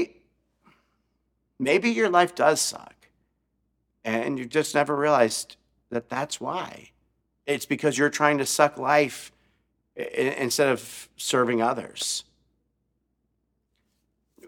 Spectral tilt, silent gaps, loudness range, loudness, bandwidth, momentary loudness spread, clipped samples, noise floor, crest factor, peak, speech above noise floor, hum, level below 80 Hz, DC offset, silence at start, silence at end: -3.5 dB/octave; none; 3 LU; -24 LUFS; 18 kHz; 13 LU; under 0.1%; -75 dBFS; 24 dB; -4 dBFS; 51 dB; none; -70 dBFS; under 0.1%; 0 s; 0 s